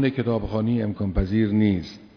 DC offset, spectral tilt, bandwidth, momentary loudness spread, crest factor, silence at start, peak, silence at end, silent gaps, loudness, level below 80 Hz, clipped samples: under 0.1%; -9 dB/octave; 5.4 kHz; 5 LU; 14 dB; 0 s; -8 dBFS; 0.1 s; none; -23 LUFS; -36 dBFS; under 0.1%